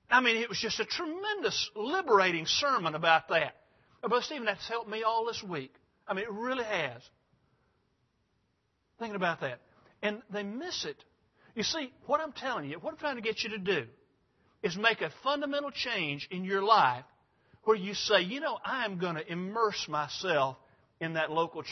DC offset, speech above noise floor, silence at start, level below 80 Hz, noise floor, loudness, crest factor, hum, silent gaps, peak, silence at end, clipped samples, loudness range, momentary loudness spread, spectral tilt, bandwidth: under 0.1%; 45 dB; 0.1 s; -72 dBFS; -76 dBFS; -31 LUFS; 24 dB; none; none; -8 dBFS; 0 s; under 0.1%; 9 LU; 12 LU; -1.5 dB/octave; 6.2 kHz